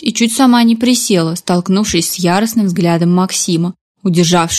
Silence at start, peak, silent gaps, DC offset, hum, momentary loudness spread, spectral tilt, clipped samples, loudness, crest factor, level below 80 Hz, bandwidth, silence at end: 0 s; 0 dBFS; 3.81-3.95 s; under 0.1%; none; 6 LU; -4.5 dB/octave; under 0.1%; -12 LUFS; 12 dB; -46 dBFS; 15 kHz; 0 s